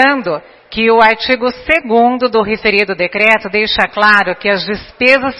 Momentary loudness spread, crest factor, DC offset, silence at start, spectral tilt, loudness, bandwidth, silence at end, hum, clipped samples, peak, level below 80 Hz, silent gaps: 8 LU; 12 dB; under 0.1%; 0 s; -5 dB/octave; -11 LUFS; 11 kHz; 0 s; none; 0.2%; 0 dBFS; -42 dBFS; none